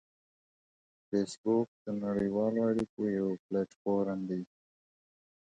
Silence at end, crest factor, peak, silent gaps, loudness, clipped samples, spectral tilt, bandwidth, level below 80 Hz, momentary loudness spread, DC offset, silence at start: 1.15 s; 16 dB; -18 dBFS; 1.38-1.44 s, 1.68-1.85 s, 2.89-2.97 s, 3.39-3.49 s, 3.76-3.85 s; -33 LUFS; under 0.1%; -7.5 dB/octave; 9.2 kHz; -68 dBFS; 7 LU; under 0.1%; 1.1 s